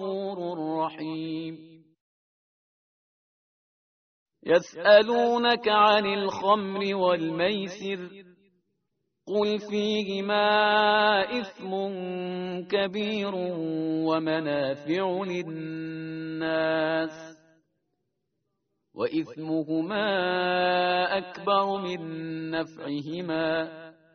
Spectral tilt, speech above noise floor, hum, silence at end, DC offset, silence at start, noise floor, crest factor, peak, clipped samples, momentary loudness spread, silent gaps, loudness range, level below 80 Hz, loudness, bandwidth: -2.5 dB/octave; 54 dB; none; 0.25 s; under 0.1%; 0 s; -80 dBFS; 22 dB; -4 dBFS; under 0.1%; 13 LU; 2.01-4.26 s; 9 LU; -70 dBFS; -26 LUFS; 6.6 kHz